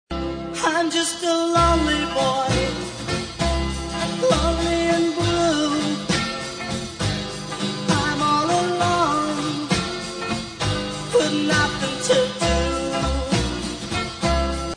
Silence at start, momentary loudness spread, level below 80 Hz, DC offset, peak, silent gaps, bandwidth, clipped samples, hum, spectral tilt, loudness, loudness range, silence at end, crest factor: 0.1 s; 8 LU; -34 dBFS; under 0.1%; -6 dBFS; none; 10 kHz; under 0.1%; none; -4 dB/octave; -22 LUFS; 1 LU; 0 s; 16 dB